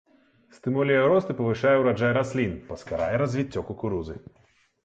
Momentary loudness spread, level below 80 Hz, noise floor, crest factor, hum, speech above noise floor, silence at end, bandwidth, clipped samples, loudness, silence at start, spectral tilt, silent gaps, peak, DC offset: 13 LU; -52 dBFS; -59 dBFS; 16 dB; none; 34 dB; 0.65 s; 8.2 kHz; under 0.1%; -25 LUFS; 0.65 s; -7.5 dB/octave; none; -10 dBFS; under 0.1%